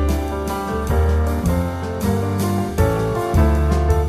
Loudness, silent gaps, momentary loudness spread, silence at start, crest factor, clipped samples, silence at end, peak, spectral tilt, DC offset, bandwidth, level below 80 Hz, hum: -20 LUFS; none; 6 LU; 0 s; 14 dB; under 0.1%; 0 s; -4 dBFS; -7 dB/octave; under 0.1%; 14 kHz; -22 dBFS; none